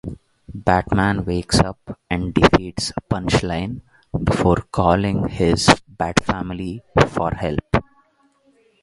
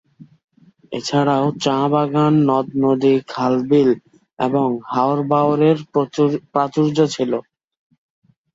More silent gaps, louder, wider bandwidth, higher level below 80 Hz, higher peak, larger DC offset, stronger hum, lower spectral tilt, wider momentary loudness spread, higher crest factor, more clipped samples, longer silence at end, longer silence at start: second, none vs 0.44-0.48 s, 4.33-4.37 s; about the same, -20 LUFS vs -18 LUFS; first, 11.5 kHz vs 8 kHz; first, -34 dBFS vs -62 dBFS; about the same, 0 dBFS vs -2 dBFS; neither; neither; second, -5.5 dB/octave vs -7 dB/octave; first, 11 LU vs 6 LU; about the same, 20 dB vs 16 dB; neither; second, 1 s vs 1.15 s; second, 0.05 s vs 0.2 s